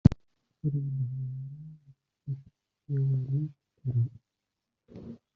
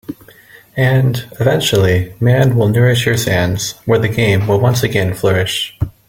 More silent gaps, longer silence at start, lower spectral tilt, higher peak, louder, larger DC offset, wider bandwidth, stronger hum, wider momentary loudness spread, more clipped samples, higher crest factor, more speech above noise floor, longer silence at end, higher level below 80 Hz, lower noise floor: neither; about the same, 0.05 s vs 0.1 s; first, -11.5 dB/octave vs -5.5 dB/octave; about the same, -2 dBFS vs 0 dBFS; second, -33 LUFS vs -14 LUFS; neither; second, 5.4 kHz vs 17 kHz; neither; first, 18 LU vs 6 LU; neither; first, 28 dB vs 14 dB; first, 55 dB vs 29 dB; about the same, 0.2 s vs 0.2 s; second, -48 dBFS vs -40 dBFS; first, -86 dBFS vs -42 dBFS